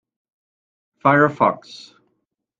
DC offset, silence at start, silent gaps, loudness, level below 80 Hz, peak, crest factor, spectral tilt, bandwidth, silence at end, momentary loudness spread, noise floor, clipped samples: under 0.1%; 1.05 s; none; -17 LUFS; -64 dBFS; -2 dBFS; 22 dB; -7.5 dB/octave; 7.6 kHz; 0.85 s; 19 LU; -74 dBFS; under 0.1%